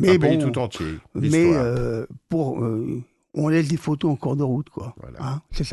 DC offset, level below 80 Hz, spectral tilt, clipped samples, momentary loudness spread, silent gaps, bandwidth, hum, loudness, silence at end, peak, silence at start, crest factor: under 0.1%; -42 dBFS; -7 dB/octave; under 0.1%; 15 LU; none; 12 kHz; none; -23 LUFS; 0 s; -4 dBFS; 0 s; 18 dB